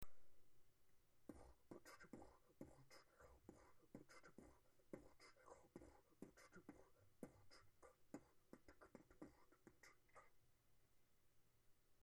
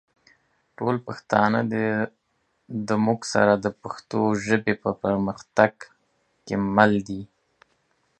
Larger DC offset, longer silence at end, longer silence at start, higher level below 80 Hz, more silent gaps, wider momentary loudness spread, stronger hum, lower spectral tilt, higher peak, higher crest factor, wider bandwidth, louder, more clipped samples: neither; second, 0 s vs 0.95 s; second, 0 s vs 0.8 s; second, -80 dBFS vs -58 dBFS; neither; second, 5 LU vs 11 LU; neither; about the same, -5 dB/octave vs -6 dB/octave; second, -38 dBFS vs 0 dBFS; about the same, 26 dB vs 24 dB; first, 19 kHz vs 9 kHz; second, -67 LUFS vs -23 LUFS; neither